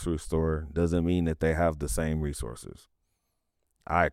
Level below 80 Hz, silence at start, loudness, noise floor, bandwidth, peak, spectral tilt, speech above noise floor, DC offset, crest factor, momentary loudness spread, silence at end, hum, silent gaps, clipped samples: -40 dBFS; 0 s; -29 LUFS; -78 dBFS; 15 kHz; -10 dBFS; -6.5 dB/octave; 50 dB; under 0.1%; 20 dB; 12 LU; 0 s; none; none; under 0.1%